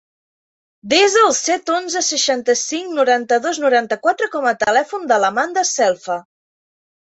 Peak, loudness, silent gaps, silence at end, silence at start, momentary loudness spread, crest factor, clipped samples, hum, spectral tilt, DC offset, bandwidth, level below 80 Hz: -2 dBFS; -16 LUFS; none; 1 s; 0.85 s; 6 LU; 16 dB; under 0.1%; none; -1 dB/octave; under 0.1%; 8.2 kHz; -64 dBFS